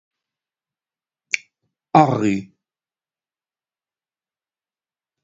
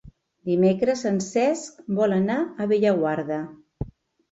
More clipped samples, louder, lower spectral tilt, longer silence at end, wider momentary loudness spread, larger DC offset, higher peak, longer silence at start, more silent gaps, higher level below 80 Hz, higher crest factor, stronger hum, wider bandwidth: neither; first, -19 LUFS vs -23 LUFS; about the same, -6 dB/octave vs -6.5 dB/octave; first, 2.8 s vs 0.45 s; second, 10 LU vs 17 LU; neither; first, 0 dBFS vs -10 dBFS; first, 1.35 s vs 0.05 s; neither; second, -62 dBFS vs -52 dBFS; first, 26 dB vs 14 dB; neither; about the same, 7.8 kHz vs 8 kHz